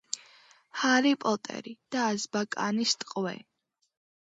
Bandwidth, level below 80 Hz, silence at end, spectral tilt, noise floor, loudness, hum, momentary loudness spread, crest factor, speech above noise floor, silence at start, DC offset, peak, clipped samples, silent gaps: 8 kHz; -80 dBFS; 0.85 s; -3 dB/octave; -59 dBFS; -29 LUFS; none; 16 LU; 22 dB; 30 dB; 0.15 s; under 0.1%; -10 dBFS; under 0.1%; none